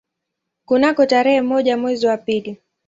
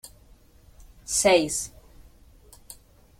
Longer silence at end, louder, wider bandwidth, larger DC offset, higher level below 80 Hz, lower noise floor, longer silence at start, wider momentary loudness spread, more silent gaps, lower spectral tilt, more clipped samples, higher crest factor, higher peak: second, 0.3 s vs 0.45 s; first, -17 LUFS vs -22 LUFS; second, 7.8 kHz vs 16.5 kHz; neither; second, -62 dBFS vs -52 dBFS; first, -79 dBFS vs -54 dBFS; first, 0.7 s vs 0.05 s; second, 9 LU vs 27 LU; neither; first, -5 dB/octave vs -2 dB/octave; neither; second, 16 dB vs 22 dB; first, -2 dBFS vs -6 dBFS